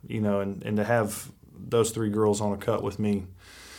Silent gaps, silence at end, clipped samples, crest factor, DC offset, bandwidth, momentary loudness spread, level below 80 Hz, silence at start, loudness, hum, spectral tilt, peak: none; 0 s; under 0.1%; 18 dB; under 0.1%; 18.5 kHz; 17 LU; -58 dBFS; 0.05 s; -27 LUFS; none; -6 dB/octave; -10 dBFS